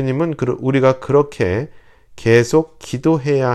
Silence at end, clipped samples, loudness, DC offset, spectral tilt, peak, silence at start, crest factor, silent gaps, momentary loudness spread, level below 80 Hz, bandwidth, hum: 0 s; under 0.1%; -17 LUFS; under 0.1%; -7 dB/octave; 0 dBFS; 0 s; 16 dB; none; 9 LU; -48 dBFS; 13 kHz; none